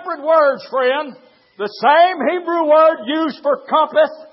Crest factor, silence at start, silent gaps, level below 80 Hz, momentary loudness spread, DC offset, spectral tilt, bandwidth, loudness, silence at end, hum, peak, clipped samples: 16 dB; 0 s; none; -84 dBFS; 9 LU; under 0.1%; -7.5 dB/octave; 5.8 kHz; -15 LUFS; 0.1 s; none; 0 dBFS; under 0.1%